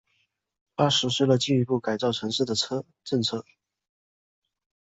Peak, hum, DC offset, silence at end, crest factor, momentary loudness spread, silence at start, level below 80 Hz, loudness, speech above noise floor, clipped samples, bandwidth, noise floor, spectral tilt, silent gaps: -8 dBFS; none; under 0.1%; 1.45 s; 20 dB; 8 LU; 0.8 s; -64 dBFS; -25 LUFS; 48 dB; under 0.1%; 8.2 kHz; -73 dBFS; -5 dB/octave; none